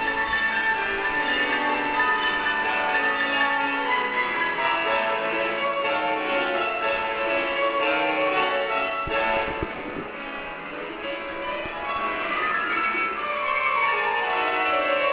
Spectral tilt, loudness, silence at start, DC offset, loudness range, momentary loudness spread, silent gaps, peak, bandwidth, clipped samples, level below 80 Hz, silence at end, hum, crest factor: 0 dB/octave; -23 LUFS; 0 s; under 0.1%; 5 LU; 9 LU; none; -10 dBFS; 4 kHz; under 0.1%; -52 dBFS; 0 s; none; 14 dB